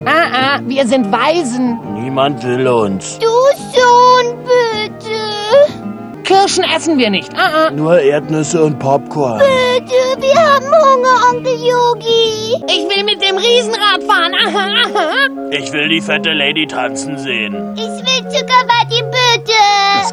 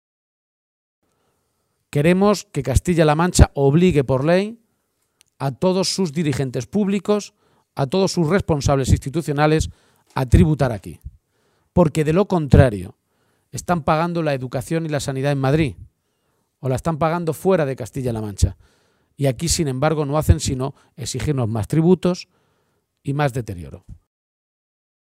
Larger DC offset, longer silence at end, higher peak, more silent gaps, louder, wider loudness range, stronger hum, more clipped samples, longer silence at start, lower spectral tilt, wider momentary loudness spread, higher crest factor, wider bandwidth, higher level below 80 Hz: neither; second, 0 s vs 1.1 s; about the same, 0 dBFS vs 0 dBFS; neither; first, -12 LUFS vs -19 LUFS; about the same, 3 LU vs 5 LU; neither; neither; second, 0 s vs 1.95 s; second, -3.5 dB/octave vs -6 dB/octave; second, 9 LU vs 13 LU; second, 12 dB vs 20 dB; second, 13 kHz vs 15.5 kHz; second, -54 dBFS vs -32 dBFS